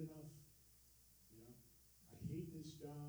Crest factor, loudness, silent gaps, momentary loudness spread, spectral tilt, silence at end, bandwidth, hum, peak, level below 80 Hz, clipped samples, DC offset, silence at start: 18 dB; -55 LUFS; none; 17 LU; -6.5 dB/octave; 0 s; over 20 kHz; none; -38 dBFS; -72 dBFS; under 0.1%; under 0.1%; 0 s